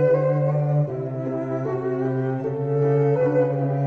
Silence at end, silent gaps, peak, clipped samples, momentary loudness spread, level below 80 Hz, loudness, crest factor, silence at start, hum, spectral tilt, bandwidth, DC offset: 0 s; none; -8 dBFS; under 0.1%; 7 LU; -60 dBFS; -23 LUFS; 12 dB; 0 s; none; -11 dB/octave; 3.3 kHz; under 0.1%